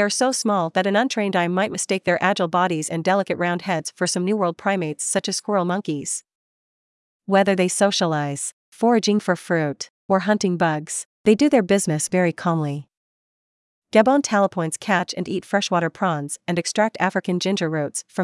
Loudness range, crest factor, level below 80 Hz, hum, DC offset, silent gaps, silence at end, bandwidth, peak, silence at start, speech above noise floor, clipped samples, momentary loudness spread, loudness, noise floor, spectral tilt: 3 LU; 20 dB; -68 dBFS; none; under 0.1%; 6.35-7.20 s, 8.53-8.72 s, 9.90-10.09 s, 11.05-11.24 s, 12.97-13.82 s; 0 s; 12 kHz; -2 dBFS; 0 s; over 69 dB; under 0.1%; 8 LU; -21 LUFS; under -90 dBFS; -4.5 dB/octave